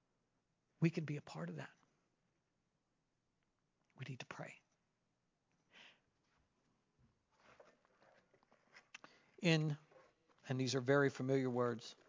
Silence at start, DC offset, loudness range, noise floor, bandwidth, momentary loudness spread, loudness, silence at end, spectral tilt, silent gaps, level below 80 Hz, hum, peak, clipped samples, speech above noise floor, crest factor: 0.8 s; under 0.1%; 19 LU; -86 dBFS; 7.6 kHz; 22 LU; -40 LUFS; 0.15 s; -6 dB/octave; none; -88 dBFS; none; -20 dBFS; under 0.1%; 47 dB; 26 dB